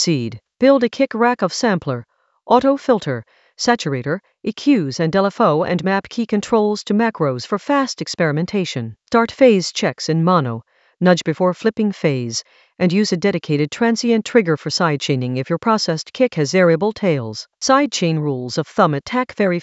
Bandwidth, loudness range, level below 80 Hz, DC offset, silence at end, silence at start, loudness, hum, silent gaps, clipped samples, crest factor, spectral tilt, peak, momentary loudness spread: 8.2 kHz; 2 LU; -58 dBFS; under 0.1%; 0 s; 0 s; -18 LUFS; none; none; under 0.1%; 18 dB; -5.5 dB/octave; 0 dBFS; 8 LU